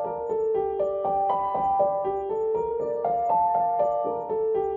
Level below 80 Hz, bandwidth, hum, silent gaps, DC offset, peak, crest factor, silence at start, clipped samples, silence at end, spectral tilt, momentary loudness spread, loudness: -58 dBFS; 3.4 kHz; none; none; under 0.1%; -12 dBFS; 14 dB; 0 s; under 0.1%; 0 s; -8.5 dB/octave; 5 LU; -25 LUFS